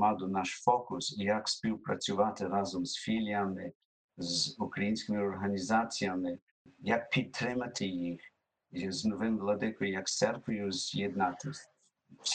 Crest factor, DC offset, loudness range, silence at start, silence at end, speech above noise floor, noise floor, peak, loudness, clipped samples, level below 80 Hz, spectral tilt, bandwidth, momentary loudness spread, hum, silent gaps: 22 dB; under 0.1%; 2 LU; 0 s; 0 s; 29 dB; -63 dBFS; -12 dBFS; -34 LUFS; under 0.1%; -70 dBFS; -4 dB/octave; 9.4 kHz; 9 LU; none; 3.75-4.09 s, 6.42-6.65 s